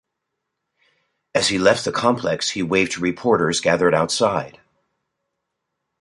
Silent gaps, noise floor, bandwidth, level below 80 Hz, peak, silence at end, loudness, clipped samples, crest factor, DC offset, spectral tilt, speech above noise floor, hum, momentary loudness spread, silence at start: none; -79 dBFS; 11.5 kHz; -54 dBFS; -2 dBFS; 1.5 s; -19 LUFS; under 0.1%; 20 dB; under 0.1%; -4 dB/octave; 60 dB; none; 5 LU; 1.35 s